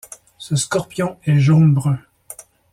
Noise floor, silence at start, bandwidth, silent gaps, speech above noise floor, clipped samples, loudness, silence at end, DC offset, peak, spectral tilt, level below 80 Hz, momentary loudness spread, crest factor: -41 dBFS; 0.4 s; 14 kHz; none; 25 dB; under 0.1%; -17 LUFS; 0.4 s; under 0.1%; -4 dBFS; -6.5 dB/octave; -52 dBFS; 24 LU; 14 dB